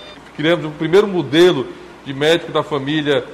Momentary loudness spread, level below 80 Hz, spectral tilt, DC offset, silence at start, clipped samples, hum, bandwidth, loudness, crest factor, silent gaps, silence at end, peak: 16 LU; -52 dBFS; -5.5 dB/octave; under 0.1%; 0 s; under 0.1%; none; 14.5 kHz; -16 LUFS; 14 dB; none; 0 s; -2 dBFS